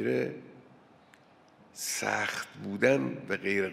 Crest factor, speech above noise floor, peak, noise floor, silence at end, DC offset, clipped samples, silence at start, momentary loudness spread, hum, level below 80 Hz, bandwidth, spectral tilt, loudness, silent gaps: 22 dB; 29 dB; -10 dBFS; -59 dBFS; 0 s; under 0.1%; under 0.1%; 0 s; 12 LU; none; -76 dBFS; 16 kHz; -4 dB/octave; -31 LUFS; none